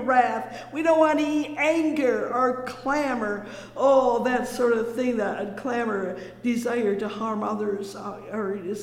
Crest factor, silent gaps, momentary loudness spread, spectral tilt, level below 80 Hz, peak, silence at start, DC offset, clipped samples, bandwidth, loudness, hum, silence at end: 18 dB; none; 11 LU; -5 dB/octave; -60 dBFS; -6 dBFS; 0 s; under 0.1%; under 0.1%; 16 kHz; -25 LUFS; none; 0 s